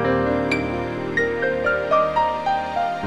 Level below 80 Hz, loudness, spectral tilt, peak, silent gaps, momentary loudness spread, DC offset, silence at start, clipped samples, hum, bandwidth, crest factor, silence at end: -44 dBFS; -21 LUFS; -6.5 dB/octave; -6 dBFS; none; 5 LU; 0.3%; 0 s; under 0.1%; none; 11.5 kHz; 14 dB; 0 s